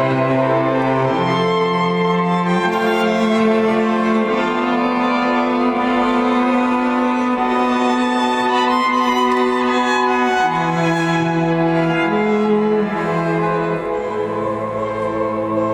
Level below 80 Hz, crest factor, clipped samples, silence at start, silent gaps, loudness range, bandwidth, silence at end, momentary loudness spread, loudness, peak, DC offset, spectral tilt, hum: -50 dBFS; 12 dB; under 0.1%; 0 s; none; 2 LU; 14 kHz; 0 s; 4 LU; -17 LUFS; -4 dBFS; under 0.1%; -6 dB/octave; none